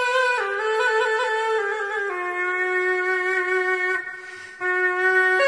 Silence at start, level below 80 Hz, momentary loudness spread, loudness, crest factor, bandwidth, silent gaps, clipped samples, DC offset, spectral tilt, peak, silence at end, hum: 0 s; -68 dBFS; 6 LU; -22 LUFS; 14 dB; 10.5 kHz; none; under 0.1%; under 0.1%; -1.5 dB/octave; -8 dBFS; 0 s; none